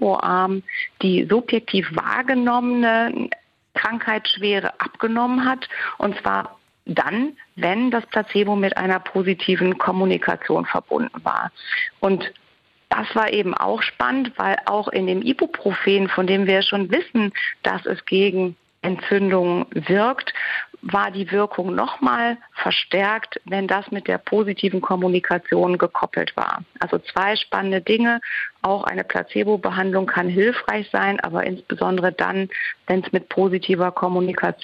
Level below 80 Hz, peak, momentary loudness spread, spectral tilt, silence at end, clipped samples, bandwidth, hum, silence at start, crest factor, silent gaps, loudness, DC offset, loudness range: -62 dBFS; -4 dBFS; 6 LU; -7.5 dB/octave; 0.1 s; under 0.1%; 6.6 kHz; none; 0 s; 16 dB; none; -21 LUFS; under 0.1%; 2 LU